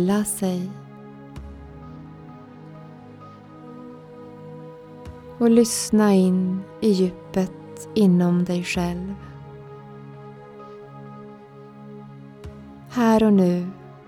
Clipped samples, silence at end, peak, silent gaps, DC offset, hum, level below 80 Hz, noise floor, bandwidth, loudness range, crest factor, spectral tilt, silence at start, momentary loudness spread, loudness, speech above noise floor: under 0.1%; 0.15 s; -4 dBFS; none; under 0.1%; none; -50 dBFS; -43 dBFS; 16.5 kHz; 21 LU; 20 dB; -6 dB/octave; 0 s; 25 LU; -21 LUFS; 24 dB